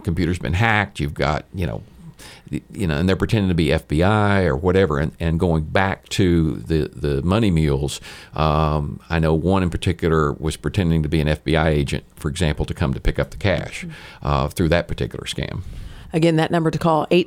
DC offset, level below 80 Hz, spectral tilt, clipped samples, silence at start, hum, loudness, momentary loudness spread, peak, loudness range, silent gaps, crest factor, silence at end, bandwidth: under 0.1%; -32 dBFS; -6.5 dB/octave; under 0.1%; 0 s; none; -20 LUFS; 10 LU; -2 dBFS; 4 LU; none; 18 dB; 0 s; 15.5 kHz